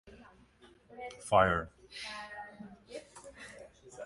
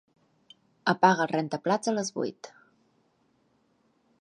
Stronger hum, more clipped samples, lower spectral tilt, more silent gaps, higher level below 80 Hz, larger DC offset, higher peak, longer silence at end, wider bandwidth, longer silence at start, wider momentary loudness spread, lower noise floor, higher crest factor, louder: neither; neither; about the same, -4.5 dB/octave vs -4.5 dB/octave; neither; first, -58 dBFS vs -80 dBFS; neither; second, -12 dBFS vs -6 dBFS; second, 0 s vs 1.7 s; about the same, 11.5 kHz vs 11.5 kHz; second, 0.05 s vs 0.85 s; first, 25 LU vs 14 LU; second, -62 dBFS vs -69 dBFS; about the same, 24 dB vs 26 dB; second, -32 LUFS vs -27 LUFS